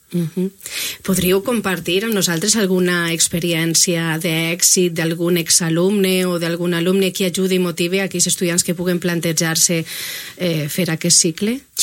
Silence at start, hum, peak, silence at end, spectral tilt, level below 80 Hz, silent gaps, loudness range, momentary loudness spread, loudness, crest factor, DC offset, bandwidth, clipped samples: 0.1 s; none; 0 dBFS; 0 s; -3.5 dB/octave; -52 dBFS; none; 2 LU; 9 LU; -17 LUFS; 18 dB; under 0.1%; 16.5 kHz; under 0.1%